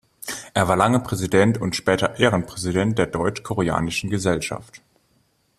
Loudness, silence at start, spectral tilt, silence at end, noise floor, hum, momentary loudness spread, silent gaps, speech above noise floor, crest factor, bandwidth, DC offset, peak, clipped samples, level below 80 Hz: -21 LUFS; 0.25 s; -5 dB/octave; 0.8 s; -64 dBFS; none; 7 LU; none; 43 dB; 20 dB; 14.5 kHz; under 0.1%; -2 dBFS; under 0.1%; -48 dBFS